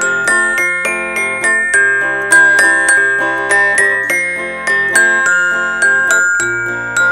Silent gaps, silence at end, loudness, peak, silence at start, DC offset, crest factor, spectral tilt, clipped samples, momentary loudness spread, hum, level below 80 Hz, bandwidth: none; 0 s; -11 LUFS; 0 dBFS; 0 s; under 0.1%; 12 dB; -1.5 dB/octave; under 0.1%; 7 LU; none; -48 dBFS; 16 kHz